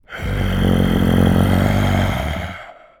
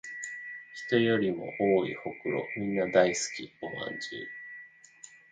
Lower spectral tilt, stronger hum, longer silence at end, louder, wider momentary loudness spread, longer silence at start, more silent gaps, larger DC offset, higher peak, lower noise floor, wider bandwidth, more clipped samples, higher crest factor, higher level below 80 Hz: first, -7 dB/octave vs -4.5 dB/octave; neither; about the same, 0.25 s vs 0.15 s; first, -17 LUFS vs -30 LUFS; second, 11 LU vs 18 LU; about the same, 0.1 s vs 0.05 s; neither; neither; first, -2 dBFS vs -8 dBFS; second, -36 dBFS vs -54 dBFS; first, 18.5 kHz vs 9.6 kHz; neither; second, 14 dB vs 22 dB; first, -26 dBFS vs -68 dBFS